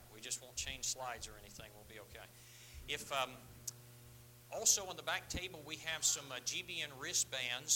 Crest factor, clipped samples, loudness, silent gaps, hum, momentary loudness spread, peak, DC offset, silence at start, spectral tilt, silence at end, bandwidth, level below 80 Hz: 26 dB; under 0.1%; -39 LUFS; none; none; 21 LU; -16 dBFS; under 0.1%; 0 s; 0 dB/octave; 0 s; 17 kHz; -62 dBFS